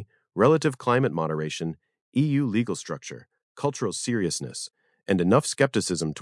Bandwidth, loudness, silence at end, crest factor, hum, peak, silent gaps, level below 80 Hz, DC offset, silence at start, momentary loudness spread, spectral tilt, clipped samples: 12 kHz; -25 LUFS; 0 s; 20 dB; none; -6 dBFS; 2.01-2.12 s, 3.43-3.55 s; -66 dBFS; under 0.1%; 0 s; 15 LU; -5.5 dB/octave; under 0.1%